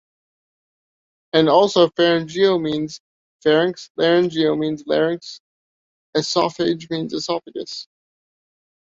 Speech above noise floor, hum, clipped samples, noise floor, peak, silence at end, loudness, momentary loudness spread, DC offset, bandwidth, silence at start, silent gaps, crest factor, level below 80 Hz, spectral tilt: over 71 dB; none; under 0.1%; under -90 dBFS; -2 dBFS; 1 s; -19 LUFS; 15 LU; under 0.1%; 7.8 kHz; 1.35 s; 3.00-3.40 s, 3.90-3.95 s, 5.40-6.13 s; 20 dB; -64 dBFS; -5 dB/octave